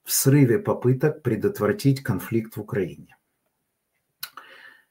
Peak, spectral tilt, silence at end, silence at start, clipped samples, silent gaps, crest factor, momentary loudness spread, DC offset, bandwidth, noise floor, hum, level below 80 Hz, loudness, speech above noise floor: -6 dBFS; -5.5 dB/octave; 0.2 s; 0.05 s; under 0.1%; none; 18 dB; 18 LU; under 0.1%; 16.5 kHz; -76 dBFS; none; -62 dBFS; -23 LUFS; 54 dB